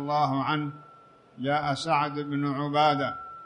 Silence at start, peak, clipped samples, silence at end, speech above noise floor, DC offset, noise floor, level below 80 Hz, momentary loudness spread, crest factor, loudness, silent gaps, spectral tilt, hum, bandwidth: 0 s; -12 dBFS; under 0.1%; 0 s; 28 dB; under 0.1%; -54 dBFS; -66 dBFS; 10 LU; 16 dB; -27 LUFS; none; -6 dB/octave; none; 10.5 kHz